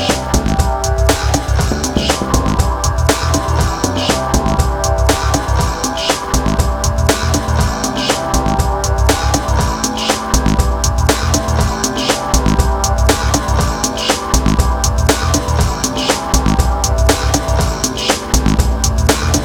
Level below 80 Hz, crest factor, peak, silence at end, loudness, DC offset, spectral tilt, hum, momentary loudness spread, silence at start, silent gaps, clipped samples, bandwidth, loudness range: -18 dBFS; 14 dB; 0 dBFS; 0 s; -15 LUFS; under 0.1%; -4 dB/octave; none; 3 LU; 0 s; none; under 0.1%; 20 kHz; 1 LU